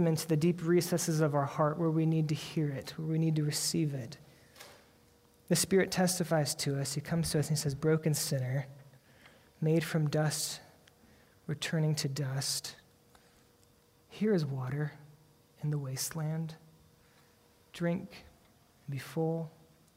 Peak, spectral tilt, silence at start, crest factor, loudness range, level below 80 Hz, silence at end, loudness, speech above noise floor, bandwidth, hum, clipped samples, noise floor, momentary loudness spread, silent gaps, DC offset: -16 dBFS; -5 dB/octave; 0 s; 18 dB; 8 LU; -66 dBFS; 0.45 s; -32 LUFS; 34 dB; 16 kHz; none; under 0.1%; -65 dBFS; 15 LU; none; under 0.1%